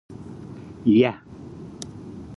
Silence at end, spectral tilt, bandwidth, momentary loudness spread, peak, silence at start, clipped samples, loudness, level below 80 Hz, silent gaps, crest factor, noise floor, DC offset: 0 s; -7 dB/octave; 11.5 kHz; 22 LU; -6 dBFS; 0.1 s; under 0.1%; -20 LUFS; -54 dBFS; none; 20 dB; -39 dBFS; under 0.1%